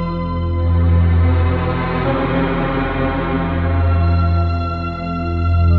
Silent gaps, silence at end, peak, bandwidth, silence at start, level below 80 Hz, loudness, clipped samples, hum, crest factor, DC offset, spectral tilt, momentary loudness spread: none; 0 s; -4 dBFS; 4.5 kHz; 0 s; -24 dBFS; -17 LUFS; under 0.1%; 50 Hz at -45 dBFS; 10 dB; under 0.1%; -10.5 dB/octave; 7 LU